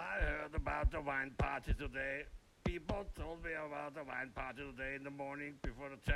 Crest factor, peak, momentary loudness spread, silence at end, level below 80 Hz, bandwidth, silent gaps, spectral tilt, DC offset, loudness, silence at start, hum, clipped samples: 20 dB; -22 dBFS; 8 LU; 0 s; -46 dBFS; 12.5 kHz; none; -6.5 dB/octave; under 0.1%; -43 LUFS; 0 s; none; under 0.1%